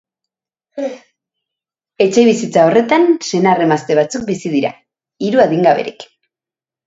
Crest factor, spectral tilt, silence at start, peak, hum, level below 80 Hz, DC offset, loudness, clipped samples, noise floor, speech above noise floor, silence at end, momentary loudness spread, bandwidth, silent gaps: 16 dB; -5.5 dB/octave; 0.75 s; 0 dBFS; none; -60 dBFS; under 0.1%; -14 LUFS; under 0.1%; -89 dBFS; 76 dB; 0.8 s; 13 LU; 8 kHz; none